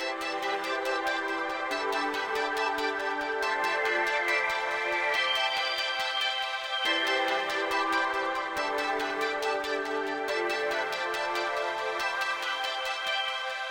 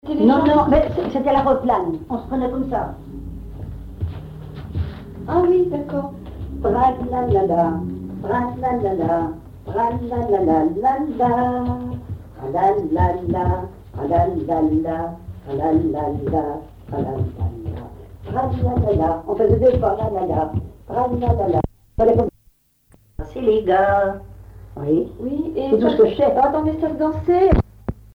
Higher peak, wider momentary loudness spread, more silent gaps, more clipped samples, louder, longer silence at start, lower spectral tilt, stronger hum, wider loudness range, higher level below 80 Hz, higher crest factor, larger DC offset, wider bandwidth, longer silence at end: second, -16 dBFS vs -4 dBFS; second, 5 LU vs 17 LU; neither; neither; second, -29 LUFS vs -20 LUFS; about the same, 0 s vs 0.05 s; second, -1 dB/octave vs -9.5 dB/octave; neither; about the same, 3 LU vs 5 LU; second, -66 dBFS vs -34 dBFS; about the same, 14 dB vs 16 dB; neither; first, 17 kHz vs 6.6 kHz; second, 0 s vs 0.15 s